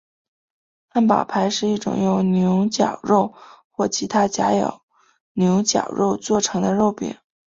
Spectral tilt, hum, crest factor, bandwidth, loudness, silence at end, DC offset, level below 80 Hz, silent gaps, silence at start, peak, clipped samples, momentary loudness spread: -5 dB/octave; none; 18 dB; 7.8 kHz; -20 LUFS; 0.3 s; under 0.1%; -58 dBFS; 3.64-3.70 s, 4.83-4.88 s, 5.20-5.35 s; 0.95 s; -2 dBFS; under 0.1%; 8 LU